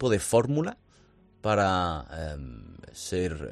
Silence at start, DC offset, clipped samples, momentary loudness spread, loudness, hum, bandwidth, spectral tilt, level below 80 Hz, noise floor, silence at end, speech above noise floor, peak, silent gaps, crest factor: 0 s; under 0.1%; under 0.1%; 18 LU; -28 LUFS; none; 13.5 kHz; -5 dB/octave; -48 dBFS; -59 dBFS; 0 s; 32 dB; -10 dBFS; none; 18 dB